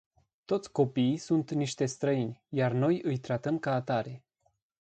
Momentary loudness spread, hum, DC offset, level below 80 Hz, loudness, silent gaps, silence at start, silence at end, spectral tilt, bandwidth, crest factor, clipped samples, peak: 6 LU; none; under 0.1%; -70 dBFS; -30 LUFS; none; 0.5 s; 0.6 s; -6.5 dB/octave; 9.2 kHz; 18 dB; under 0.1%; -14 dBFS